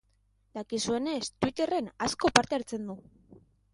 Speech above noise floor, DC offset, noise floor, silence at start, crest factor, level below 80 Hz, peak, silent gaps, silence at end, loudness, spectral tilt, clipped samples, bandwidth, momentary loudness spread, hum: 39 dB; under 0.1%; -70 dBFS; 0.55 s; 32 dB; -60 dBFS; 0 dBFS; none; 0.35 s; -30 LUFS; -3 dB/octave; under 0.1%; 11.5 kHz; 17 LU; none